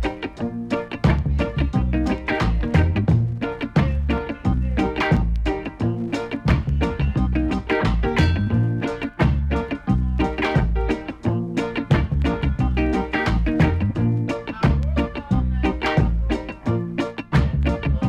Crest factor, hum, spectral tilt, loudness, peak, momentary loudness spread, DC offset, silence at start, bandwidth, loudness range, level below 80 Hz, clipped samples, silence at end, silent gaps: 14 dB; none; -8 dB/octave; -22 LUFS; -6 dBFS; 6 LU; under 0.1%; 0 s; 8.8 kHz; 1 LU; -26 dBFS; under 0.1%; 0 s; none